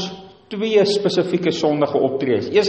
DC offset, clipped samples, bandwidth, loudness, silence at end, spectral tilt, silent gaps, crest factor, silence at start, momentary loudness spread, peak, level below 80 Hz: under 0.1%; under 0.1%; 8.6 kHz; -19 LUFS; 0 s; -5.5 dB/octave; none; 16 dB; 0 s; 13 LU; -4 dBFS; -60 dBFS